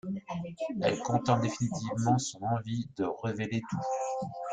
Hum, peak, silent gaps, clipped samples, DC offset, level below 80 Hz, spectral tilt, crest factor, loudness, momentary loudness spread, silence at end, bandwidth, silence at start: none; -12 dBFS; none; under 0.1%; under 0.1%; -64 dBFS; -6 dB/octave; 20 dB; -32 LUFS; 8 LU; 0 s; 9.4 kHz; 0.05 s